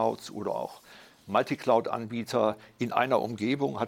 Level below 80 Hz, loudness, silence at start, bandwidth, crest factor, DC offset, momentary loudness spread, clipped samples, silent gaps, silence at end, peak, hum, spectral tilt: -74 dBFS; -29 LUFS; 0 s; 16.5 kHz; 20 dB; under 0.1%; 9 LU; under 0.1%; none; 0 s; -8 dBFS; none; -6 dB/octave